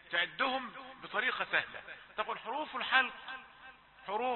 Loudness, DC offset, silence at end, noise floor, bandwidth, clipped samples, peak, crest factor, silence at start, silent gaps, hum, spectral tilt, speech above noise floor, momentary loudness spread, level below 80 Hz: -34 LUFS; under 0.1%; 0 s; -57 dBFS; 4.2 kHz; under 0.1%; -12 dBFS; 24 dB; 0.05 s; none; none; 1.5 dB/octave; 21 dB; 18 LU; -74 dBFS